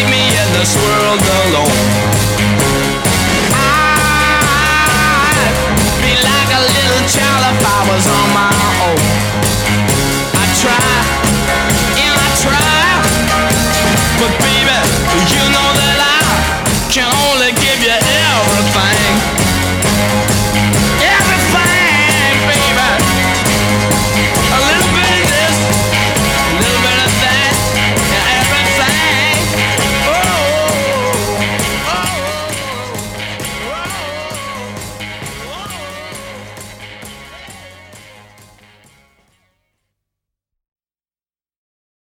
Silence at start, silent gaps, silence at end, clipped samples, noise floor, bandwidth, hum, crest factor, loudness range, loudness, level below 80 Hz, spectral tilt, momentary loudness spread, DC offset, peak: 0 s; none; 4.05 s; under 0.1%; under -90 dBFS; over 20 kHz; none; 12 dB; 12 LU; -11 LUFS; -28 dBFS; -3 dB/octave; 11 LU; under 0.1%; 0 dBFS